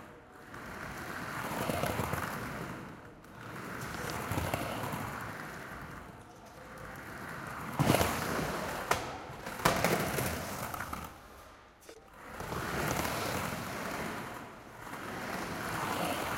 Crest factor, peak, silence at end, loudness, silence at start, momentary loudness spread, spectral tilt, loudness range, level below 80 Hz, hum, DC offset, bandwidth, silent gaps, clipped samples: 28 dB; -8 dBFS; 0 s; -36 LUFS; 0 s; 19 LU; -4.5 dB/octave; 7 LU; -54 dBFS; none; under 0.1%; 17 kHz; none; under 0.1%